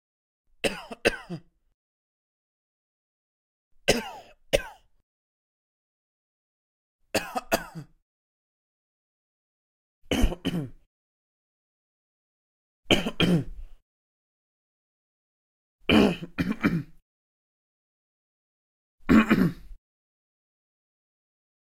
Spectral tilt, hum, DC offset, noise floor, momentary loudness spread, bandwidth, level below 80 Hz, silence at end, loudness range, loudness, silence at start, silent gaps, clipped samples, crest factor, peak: -5 dB/octave; none; under 0.1%; -44 dBFS; 20 LU; 16.5 kHz; -42 dBFS; 2 s; 7 LU; -26 LUFS; 0.65 s; 1.74-3.71 s, 5.03-6.99 s, 8.02-10.02 s, 10.86-12.83 s, 13.82-15.79 s, 17.02-18.98 s; under 0.1%; 28 dB; -4 dBFS